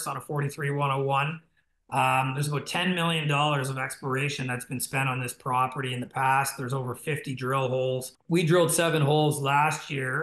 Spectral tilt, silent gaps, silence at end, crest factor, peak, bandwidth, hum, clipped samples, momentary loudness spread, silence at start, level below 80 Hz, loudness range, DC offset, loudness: -4.5 dB/octave; none; 0 s; 16 dB; -10 dBFS; 13 kHz; none; under 0.1%; 9 LU; 0 s; -68 dBFS; 3 LU; under 0.1%; -27 LUFS